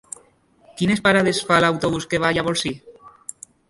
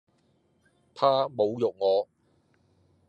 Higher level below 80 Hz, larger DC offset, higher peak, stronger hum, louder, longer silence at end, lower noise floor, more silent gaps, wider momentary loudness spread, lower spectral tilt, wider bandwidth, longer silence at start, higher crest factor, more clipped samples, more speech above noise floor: first, -50 dBFS vs -82 dBFS; neither; first, -2 dBFS vs -8 dBFS; neither; first, -19 LUFS vs -26 LUFS; second, 0.6 s vs 1.05 s; second, -56 dBFS vs -68 dBFS; neither; first, 21 LU vs 4 LU; second, -4.5 dB/octave vs -7 dB/octave; first, 11.5 kHz vs 8.2 kHz; second, 0.75 s vs 0.95 s; about the same, 20 dB vs 22 dB; neither; second, 37 dB vs 43 dB